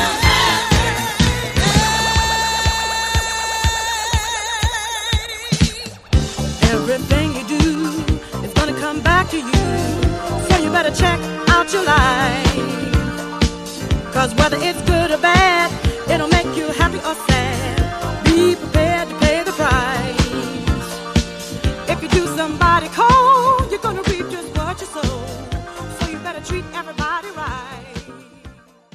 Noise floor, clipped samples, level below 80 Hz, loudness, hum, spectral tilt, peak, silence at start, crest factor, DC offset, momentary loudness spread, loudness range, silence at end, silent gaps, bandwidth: -42 dBFS; under 0.1%; -26 dBFS; -17 LUFS; none; -4.5 dB/octave; 0 dBFS; 0 s; 18 dB; under 0.1%; 11 LU; 4 LU; 0.4 s; none; 15.5 kHz